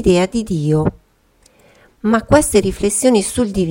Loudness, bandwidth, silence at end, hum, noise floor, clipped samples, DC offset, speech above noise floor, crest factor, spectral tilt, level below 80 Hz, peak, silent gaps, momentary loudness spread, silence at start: -15 LUFS; 17 kHz; 0 s; none; -54 dBFS; under 0.1%; under 0.1%; 39 dB; 16 dB; -5 dB/octave; -36 dBFS; 0 dBFS; none; 6 LU; 0 s